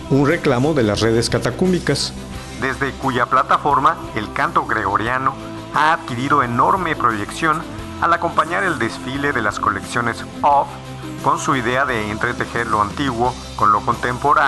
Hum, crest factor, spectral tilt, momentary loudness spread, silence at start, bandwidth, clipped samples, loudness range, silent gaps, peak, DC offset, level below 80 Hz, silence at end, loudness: none; 14 dB; -5 dB/octave; 7 LU; 0 s; 12.5 kHz; under 0.1%; 2 LU; none; -4 dBFS; under 0.1%; -40 dBFS; 0 s; -18 LUFS